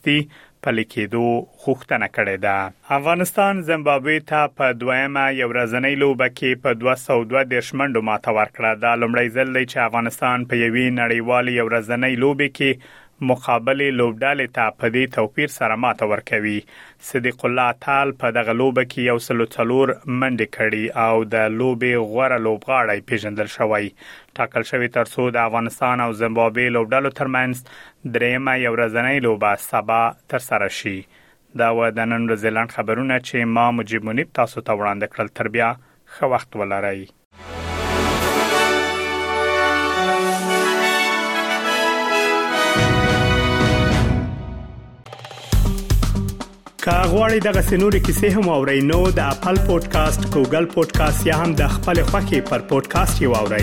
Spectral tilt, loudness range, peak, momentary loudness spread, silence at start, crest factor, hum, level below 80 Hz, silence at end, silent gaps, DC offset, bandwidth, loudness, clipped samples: -5 dB/octave; 4 LU; -2 dBFS; 7 LU; 0.05 s; 16 dB; none; -32 dBFS; 0 s; 37.25-37.31 s; under 0.1%; 16.5 kHz; -19 LUFS; under 0.1%